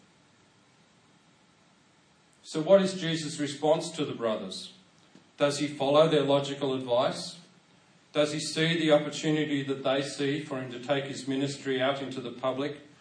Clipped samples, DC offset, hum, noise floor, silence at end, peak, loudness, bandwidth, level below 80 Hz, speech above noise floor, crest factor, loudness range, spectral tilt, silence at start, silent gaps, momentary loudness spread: under 0.1%; under 0.1%; none; -63 dBFS; 0.15 s; -10 dBFS; -28 LUFS; 10.5 kHz; -80 dBFS; 35 dB; 20 dB; 3 LU; -5 dB/octave; 2.45 s; none; 13 LU